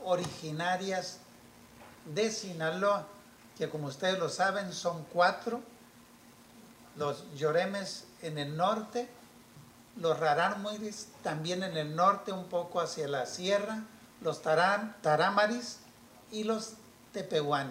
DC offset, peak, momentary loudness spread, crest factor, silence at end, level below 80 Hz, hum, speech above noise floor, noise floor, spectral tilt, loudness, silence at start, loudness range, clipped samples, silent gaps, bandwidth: under 0.1%; -14 dBFS; 14 LU; 20 dB; 0 s; -74 dBFS; none; 25 dB; -57 dBFS; -4 dB/octave; -32 LUFS; 0 s; 4 LU; under 0.1%; none; 16 kHz